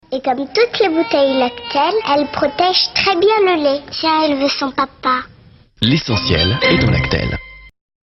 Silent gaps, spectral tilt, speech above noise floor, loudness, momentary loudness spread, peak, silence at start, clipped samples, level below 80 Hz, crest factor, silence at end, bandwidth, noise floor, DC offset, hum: none; -6 dB/octave; 30 dB; -15 LUFS; 6 LU; 0 dBFS; 0.1 s; under 0.1%; -36 dBFS; 16 dB; 0.35 s; 7.4 kHz; -45 dBFS; under 0.1%; none